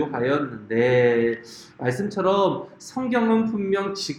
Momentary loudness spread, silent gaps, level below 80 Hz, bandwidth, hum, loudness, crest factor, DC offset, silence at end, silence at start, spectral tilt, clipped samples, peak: 12 LU; none; -62 dBFS; 12.5 kHz; none; -22 LUFS; 16 dB; under 0.1%; 0 s; 0 s; -6 dB/octave; under 0.1%; -6 dBFS